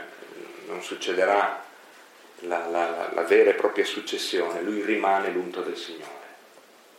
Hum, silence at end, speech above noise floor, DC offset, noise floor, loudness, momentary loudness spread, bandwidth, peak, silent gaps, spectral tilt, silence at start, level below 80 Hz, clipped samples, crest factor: none; 0.6 s; 28 dB; under 0.1%; -53 dBFS; -25 LUFS; 21 LU; 16 kHz; -8 dBFS; none; -3 dB/octave; 0 s; under -90 dBFS; under 0.1%; 20 dB